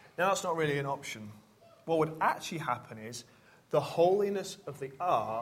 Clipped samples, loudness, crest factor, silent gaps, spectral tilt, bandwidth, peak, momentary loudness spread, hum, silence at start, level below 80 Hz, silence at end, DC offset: under 0.1%; -32 LUFS; 18 dB; none; -5 dB/octave; 16 kHz; -14 dBFS; 16 LU; none; 0.2 s; -72 dBFS; 0 s; under 0.1%